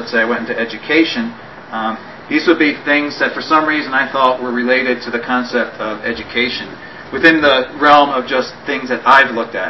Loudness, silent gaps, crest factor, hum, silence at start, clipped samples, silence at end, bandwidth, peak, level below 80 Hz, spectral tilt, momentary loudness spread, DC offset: -14 LUFS; none; 16 dB; none; 0 s; 0.1%; 0 s; 8 kHz; 0 dBFS; -52 dBFS; -4.5 dB/octave; 12 LU; 0.4%